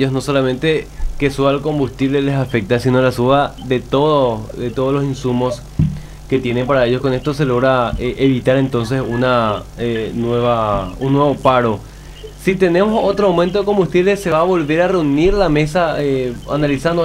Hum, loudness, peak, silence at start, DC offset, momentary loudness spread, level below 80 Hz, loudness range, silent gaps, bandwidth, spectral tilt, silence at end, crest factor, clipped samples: none; -16 LUFS; 0 dBFS; 0 s; under 0.1%; 7 LU; -32 dBFS; 3 LU; none; 16 kHz; -7 dB/octave; 0 s; 14 dB; under 0.1%